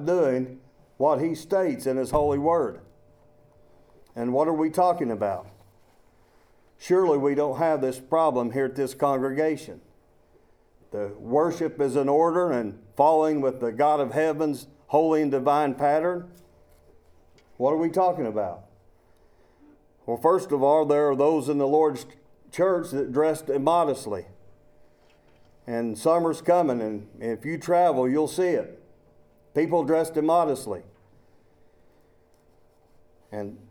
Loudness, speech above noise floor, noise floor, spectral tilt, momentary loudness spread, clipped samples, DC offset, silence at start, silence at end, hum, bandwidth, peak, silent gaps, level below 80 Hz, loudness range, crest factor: -24 LUFS; 36 dB; -60 dBFS; -6.5 dB/octave; 13 LU; under 0.1%; under 0.1%; 0 s; 0.15 s; none; 18.5 kHz; -6 dBFS; none; -58 dBFS; 5 LU; 20 dB